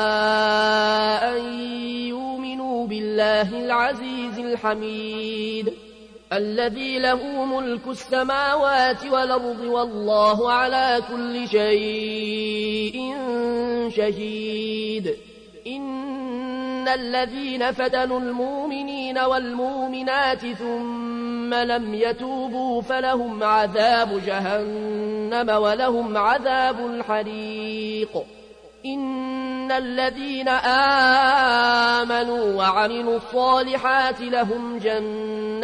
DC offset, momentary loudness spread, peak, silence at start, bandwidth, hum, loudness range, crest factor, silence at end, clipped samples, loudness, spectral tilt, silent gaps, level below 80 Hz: under 0.1%; 10 LU; -6 dBFS; 0 s; 10.5 kHz; none; 7 LU; 16 dB; 0 s; under 0.1%; -22 LUFS; -4.5 dB/octave; none; -56 dBFS